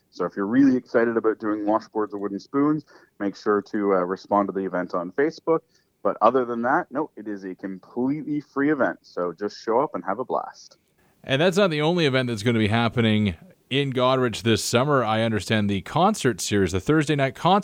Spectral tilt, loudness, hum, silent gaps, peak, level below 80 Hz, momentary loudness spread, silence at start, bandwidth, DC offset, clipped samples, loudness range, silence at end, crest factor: -5.5 dB/octave; -23 LUFS; none; none; -4 dBFS; -60 dBFS; 10 LU; 0.15 s; 16.5 kHz; under 0.1%; under 0.1%; 4 LU; 0 s; 20 dB